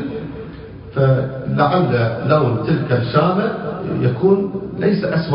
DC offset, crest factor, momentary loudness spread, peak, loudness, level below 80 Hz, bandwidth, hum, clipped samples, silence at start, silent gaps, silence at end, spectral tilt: under 0.1%; 16 dB; 11 LU; -2 dBFS; -17 LUFS; -44 dBFS; 5.4 kHz; none; under 0.1%; 0 s; none; 0 s; -12.5 dB/octave